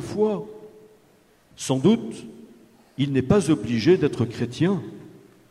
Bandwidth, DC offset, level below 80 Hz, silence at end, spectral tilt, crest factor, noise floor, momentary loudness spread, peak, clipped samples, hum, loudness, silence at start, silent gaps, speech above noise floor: 13 kHz; under 0.1%; -54 dBFS; 0.35 s; -6.5 dB/octave; 18 dB; -58 dBFS; 21 LU; -6 dBFS; under 0.1%; none; -23 LUFS; 0 s; none; 36 dB